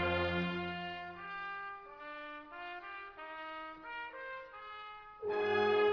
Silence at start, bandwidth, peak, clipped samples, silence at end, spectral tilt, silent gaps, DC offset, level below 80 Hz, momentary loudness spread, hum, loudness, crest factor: 0 s; 5.4 kHz; -20 dBFS; under 0.1%; 0 s; -3 dB/octave; none; under 0.1%; -64 dBFS; 14 LU; none; -40 LUFS; 18 dB